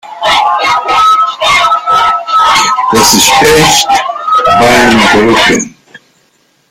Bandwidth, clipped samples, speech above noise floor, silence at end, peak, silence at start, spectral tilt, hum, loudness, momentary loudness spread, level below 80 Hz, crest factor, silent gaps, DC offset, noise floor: over 20 kHz; 0.5%; 46 dB; 0.75 s; 0 dBFS; 0.05 s; -2.5 dB/octave; none; -6 LUFS; 6 LU; -36 dBFS; 8 dB; none; under 0.1%; -52 dBFS